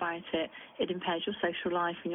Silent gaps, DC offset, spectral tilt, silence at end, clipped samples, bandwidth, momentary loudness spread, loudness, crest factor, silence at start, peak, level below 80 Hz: none; under 0.1%; -8.5 dB/octave; 0 s; under 0.1%; 3.9 kHz; 4 LU; -34 LUFS; 16 dB; 0 s; -16 dBFS; -70 dBFS